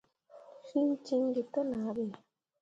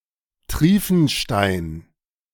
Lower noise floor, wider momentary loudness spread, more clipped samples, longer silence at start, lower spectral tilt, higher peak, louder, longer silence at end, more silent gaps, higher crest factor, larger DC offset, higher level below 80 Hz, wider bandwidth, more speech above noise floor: first, -57 dBFS vs -46 dBFS; second, 12 LU vs 15 LU; neither; second, 0.35 s vs 0.5 s; first, -7.5 dB/octave vs -5.5 dB/octave; second, -20 dBFS vs -4 dBFS; second, -34 LUFS vs -19 LUFS; about the same, 0.45 s vs 0.5 s; neither; about the same, 14 dB vs 18 dB; neither; second, -76 dBFS vs -38 dBFS; second, 7.8 kHz vs 18 kHz; about the same, 25 dB vs 28 dB